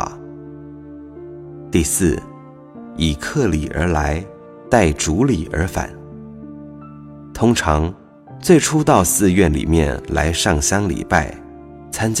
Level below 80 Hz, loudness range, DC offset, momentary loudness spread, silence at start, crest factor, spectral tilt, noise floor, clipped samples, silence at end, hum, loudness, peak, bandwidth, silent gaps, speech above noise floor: -30 dBFS; 6 LU; under 0.1%; 23 LU; 0 s; 18 dB; -4.5 dB/octave; -38 dBFS; under 0.1%; 0 s; none; -17 LUFS; 0 dBFS; 16 kHz; none; 22 dB